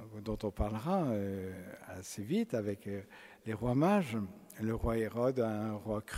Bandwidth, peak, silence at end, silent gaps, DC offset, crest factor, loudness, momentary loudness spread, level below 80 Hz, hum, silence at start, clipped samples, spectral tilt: 16 kHz; -18 dBFS; 0 s; none; under 0.1%; 18 dB; -36 LUFS; 14 LU; -50 dBFS; none; 0 s; under 0.1%; -7 dB/octave